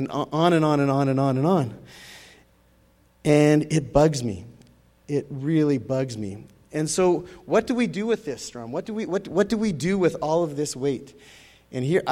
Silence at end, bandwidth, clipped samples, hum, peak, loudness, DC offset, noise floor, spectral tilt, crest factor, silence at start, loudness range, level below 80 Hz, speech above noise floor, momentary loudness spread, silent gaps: 0 s; 15 kHz; under 0.1%; none; -4 dBFS; -23 LUFS; under 0.1%; -59 dBFS; -6 dB/octave; 20 dB; 0 s; 3 LU; -52 dBFS; 36 dB; 14 LU; none